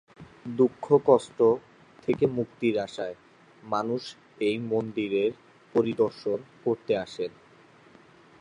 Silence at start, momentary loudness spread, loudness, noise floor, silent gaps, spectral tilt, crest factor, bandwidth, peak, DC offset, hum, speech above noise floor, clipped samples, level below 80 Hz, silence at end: 0.2 s; 13 LU; -27 LUFS; -55 dBFS; none; -7 dB/octave; 20 dB; 10 kHz; -8 dBFS; under 0.1%; none; 29 dB; under 0.1%; -68 dBFS; 1.1 s